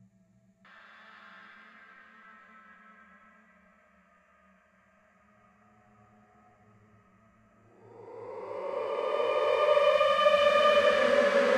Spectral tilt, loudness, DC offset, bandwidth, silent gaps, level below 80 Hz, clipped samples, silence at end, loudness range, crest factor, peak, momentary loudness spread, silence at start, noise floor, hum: -3 dB/octave; -25 LUFS; under 0.1%; 11.5 kHz; none; -70 dBFS; under 0.1%; 0 s; 28 LU; 20 dB; -12 dBFS; 22 LU; 8 s; -65 dBFS; none